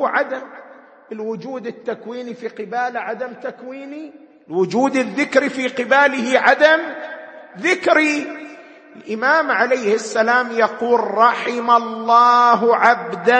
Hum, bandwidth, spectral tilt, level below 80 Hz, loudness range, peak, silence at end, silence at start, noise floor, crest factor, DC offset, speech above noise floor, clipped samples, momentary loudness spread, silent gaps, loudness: none; 8.8 kHz; -4 dB/octave; -70 dBFS; 12 LU; 0 dBFS; 0 s; 0 s; -40 dBFS; 18 dB; under 0.1%; 23 dB; under 0.1%; 18 LU; none; -16 LUFS